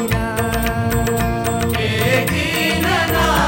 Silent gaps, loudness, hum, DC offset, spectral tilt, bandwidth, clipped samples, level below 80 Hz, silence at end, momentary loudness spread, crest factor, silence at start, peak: none; -17 LUFS; none; under 0.1%; -4.5 dB/octave; over 20 kHz; under 0.1%; -28 dBFS; 0 s; 3 LU; 14 dB; 0 s; -4 dBFS